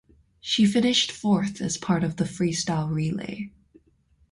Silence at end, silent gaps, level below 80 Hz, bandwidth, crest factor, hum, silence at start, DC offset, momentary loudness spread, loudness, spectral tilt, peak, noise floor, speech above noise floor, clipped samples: 0.85 s; none; -56 dBFS; 11.5 kHz; 18 dB; none; 0.45 s; under 0.1%; 14 LU; -24 LUFS; -4.5 dB/octave; -8 dBFS; -63 dBFS; 39 dB; under 0.1%